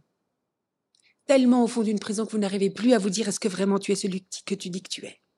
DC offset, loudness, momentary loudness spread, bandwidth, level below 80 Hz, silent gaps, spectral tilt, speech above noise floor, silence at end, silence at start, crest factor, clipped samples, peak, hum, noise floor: under 0.1%; -25 LUFS; 12 LU; 12 kHz; -78 dBFS; none; -5 dB/octave; 58 dB; 0.25 s; 1.3 s; 20 dB; under 0.1%; -6 dBFS; none; -82 dBFS